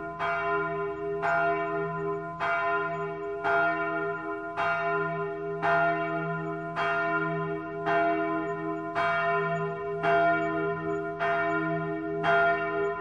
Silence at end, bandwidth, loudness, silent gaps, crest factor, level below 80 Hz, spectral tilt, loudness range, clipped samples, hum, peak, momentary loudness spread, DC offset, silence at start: 0 s; 7.6 kHz; -28 LUFS; none; 14 dB; -62 dBFS; -7 dB/octave; 2 LU; under 0.1%; none; -14 dBFS; 7 LU; under 0.1%; 0 s